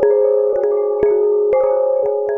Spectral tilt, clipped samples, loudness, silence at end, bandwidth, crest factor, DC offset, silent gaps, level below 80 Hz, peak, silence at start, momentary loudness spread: -9 dB/octave; under 0.1%; -15 LUFS; 0 s; 2.7 kHz; 12 dB; under 0.1%; none; -50 dBFS; -2 dBFS; 0 s; 3 LU